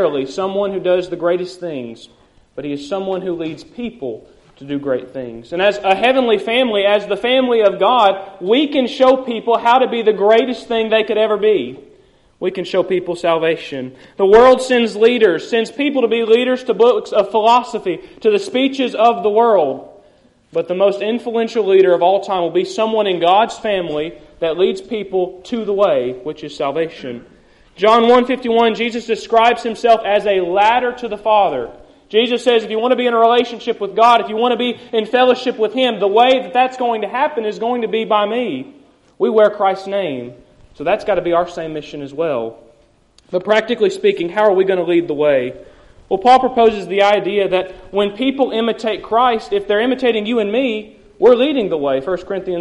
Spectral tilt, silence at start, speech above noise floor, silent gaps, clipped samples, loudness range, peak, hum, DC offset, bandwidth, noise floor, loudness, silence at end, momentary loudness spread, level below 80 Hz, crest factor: -5 dB/octave; 0 s; 37 dB; none; under 0.1%; 5 LU; 0 dBFS; none; under 0.1%; 11.5 kHz; -52 dBFS; -15 LUFS; 0 s; 12 LU; -52 dBFS; 14 dB